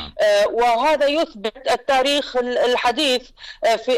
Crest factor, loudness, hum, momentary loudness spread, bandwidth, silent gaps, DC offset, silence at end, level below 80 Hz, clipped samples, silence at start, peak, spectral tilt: 8 dB; -19 LUFS; none; 7 LU; 15.5 kHz; none; under 0.1%; 0 s; -50 dBFS; under 0.1%; 0 s; -12 dBFS; -2 dB/octave